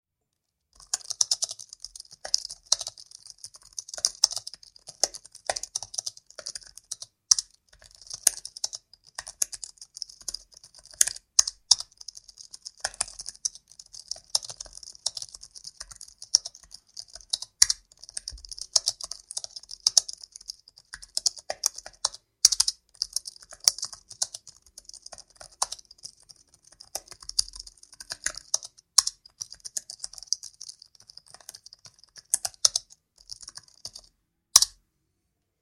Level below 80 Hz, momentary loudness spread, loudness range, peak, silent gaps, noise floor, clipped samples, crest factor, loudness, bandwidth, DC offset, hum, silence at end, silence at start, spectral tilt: -62 dBFS; 22 LU; 8 LU; 0 dBFS; none; -82 dBFS; under 0.1%; 32 dB; -26 LUFS; 16 kHz; under 0.1%; none; 0.9 s; 0.95 s; 3 dB/octave